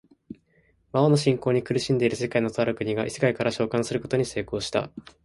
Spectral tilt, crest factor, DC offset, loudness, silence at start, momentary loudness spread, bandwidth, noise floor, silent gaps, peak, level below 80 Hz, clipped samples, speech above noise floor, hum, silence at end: -6 dB/octave; 18 dB; under 0.1%; -25 LUFS; 0.3 s; 7 LU; 11.5 kHz; -64 dBFS; none; -6 dBFS; -56 dBFS; under 0.1%; 40 dB; none; 0.25 s